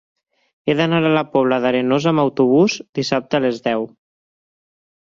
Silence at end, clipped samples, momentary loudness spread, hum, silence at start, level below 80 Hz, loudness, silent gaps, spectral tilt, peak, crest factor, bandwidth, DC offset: 1.25 s; under 0.1%; 8 LU; none; 0.65 s; -60 dBFS; -18 LUFS; 2.89-2.93 s; -6 dB/octave; -2 dBFS; 16 dB; 7.6 kHz; under 0.1%